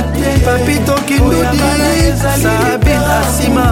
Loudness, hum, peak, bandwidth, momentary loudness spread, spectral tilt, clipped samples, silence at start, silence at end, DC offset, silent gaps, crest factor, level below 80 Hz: -12 LUFS; none; 0 dBFS; 17 kHz; 1 LU; -5 dB/octave; under 0.1%; 0 s; 0 s; under 0.1%; none; 10 dB; -18 dBFS